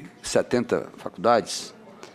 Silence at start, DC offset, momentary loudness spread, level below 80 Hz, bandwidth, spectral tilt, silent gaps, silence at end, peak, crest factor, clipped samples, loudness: 0 s; under 0.1%; 16 LU; -58 dBFS; 15 kHz; -4 dB/octave; none; 0.05 s; -6 dBFS; 20 dB; under 0.1%; -25 LUFS